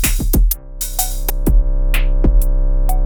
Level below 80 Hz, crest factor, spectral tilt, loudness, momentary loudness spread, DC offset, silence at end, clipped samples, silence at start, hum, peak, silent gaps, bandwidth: -14 dBFS; 12 dB; -4.5 dB/octave; -18 LUFS; 3 LU; under 0.1%; 0 s; under 0.1%; 0 s; none; -2 dBFS; none; over 20 kHz